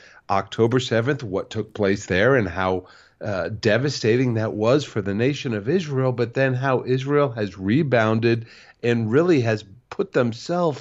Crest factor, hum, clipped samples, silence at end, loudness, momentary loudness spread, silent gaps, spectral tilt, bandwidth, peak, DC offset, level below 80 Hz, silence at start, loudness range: 16 dB; none; under 0.1%; 0 s; -22 LUFS; 8 LU; none; -6.5 dB/octave; 8 kHz; -4 dBFS; under 0.1%; -56 dBFS; 0.3 s; 1 LU